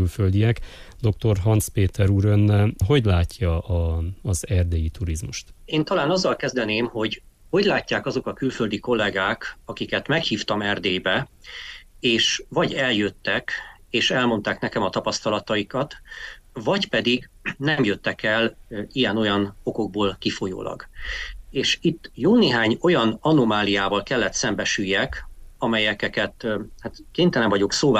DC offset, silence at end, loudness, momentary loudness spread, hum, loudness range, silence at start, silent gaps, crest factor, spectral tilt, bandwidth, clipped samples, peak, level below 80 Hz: under 0.1%; 0 s; -22 LUFS; 12 LU; none; 4 LU; 0 s; none; 16 dB; -5 dB/octave; 15 kHz; under 0.1%; -8 dBFS; -40 dBFS